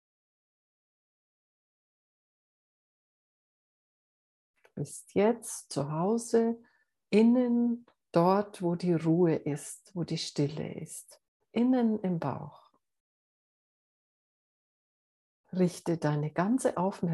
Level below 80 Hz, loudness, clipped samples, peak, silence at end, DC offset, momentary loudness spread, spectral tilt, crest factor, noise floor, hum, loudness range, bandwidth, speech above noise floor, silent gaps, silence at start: -76 dBFS; -30 LUFS; under 0.1%; -10 dBFS; 0 s; under 0.1%; 14 LU; -6.5 dB/octave; 20 dB; under -90 dBFS; none; 11 LU; 12.5 kHz; over 61 dB; 11.28-11.40 s, 13.00-15.44 s; 4.75 s